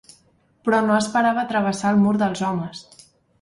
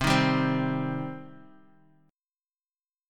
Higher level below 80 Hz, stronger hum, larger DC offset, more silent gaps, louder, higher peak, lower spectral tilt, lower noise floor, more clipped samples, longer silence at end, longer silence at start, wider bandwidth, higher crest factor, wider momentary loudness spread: second, -60 dBFS vs -50 dBFS; neither; neither; neither; first, -20 LUFS vs -27 LUFS; first, -6 dBFS vs -10 dBFS; about the same, -5.5 dB/octave vs -5.5 dB/octave; second, -60 dBFS vs under -90 dBFS; neither; second, 0.6 s vs 1.7 s; first, 0.65 s vs 0 s; second, 11.5 kHz vs 17 kHz; about the same, 16 dB vs 20 dB; second, 10 LU vs 20 LU